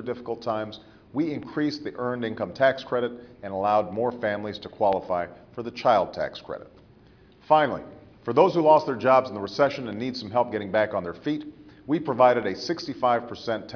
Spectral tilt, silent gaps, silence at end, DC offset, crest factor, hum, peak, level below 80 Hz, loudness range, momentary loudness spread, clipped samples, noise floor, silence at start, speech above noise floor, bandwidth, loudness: -6.5 dB/octave; none; 0 s; under 0.1%; 22 dB; none; -4 dBFS; -62 dBFS; 5 LU; 15 LU; under 0.1%; -54 dBFS; 0 s; 29 dB; 5.4 kHz; -25 LUFS